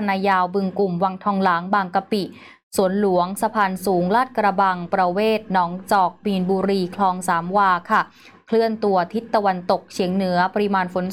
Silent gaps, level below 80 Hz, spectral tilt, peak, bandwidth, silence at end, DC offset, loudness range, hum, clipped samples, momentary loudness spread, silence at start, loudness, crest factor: 2.63-2.71 s; -62 dBFS; -6 dB/octave; -6 dBFS; 16.5 kHz; 0 s; 0.2%; 1 LU; none; under 0.1%; 4 LU; 0 s; -20 LUFS; 14 dB